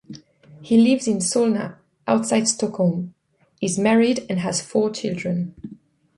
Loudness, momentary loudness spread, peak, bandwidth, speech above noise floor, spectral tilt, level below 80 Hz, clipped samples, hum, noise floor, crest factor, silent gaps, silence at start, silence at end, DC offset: -21 LUFS; 15 LU; -6 dBFS; 11.5 kHz; 27 dB; -5 dB/octave; -62 dBFS; under 0.1%; none; -47 dBFS; 16 dB; none; 0.1 s; 0.45 s; under 0.1%